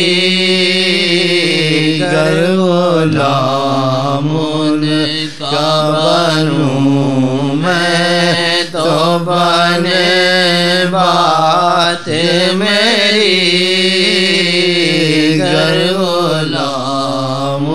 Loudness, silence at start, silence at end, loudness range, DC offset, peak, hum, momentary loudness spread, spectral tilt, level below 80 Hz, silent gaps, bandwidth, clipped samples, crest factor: -11 LUFS; 0 s; 0 s; 3 LU; 2%; 0 dBFS; none; 5 LU; -4.5 dB/octave; -56 dBFS; none; 14 kHz; under 0.1%; 12 dB